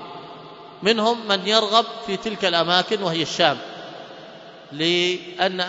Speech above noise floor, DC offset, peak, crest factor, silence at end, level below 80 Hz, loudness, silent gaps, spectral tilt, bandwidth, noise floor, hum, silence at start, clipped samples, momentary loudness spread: 21 dB; under 0.1%; -2 dBFS; 22 dB; 0 s; -66 dBFS; -20 LUFS; none; -3.5 dB/octave; 8 kHz; -42 dBFS; none; 0 s; under 0.1%; 21 LU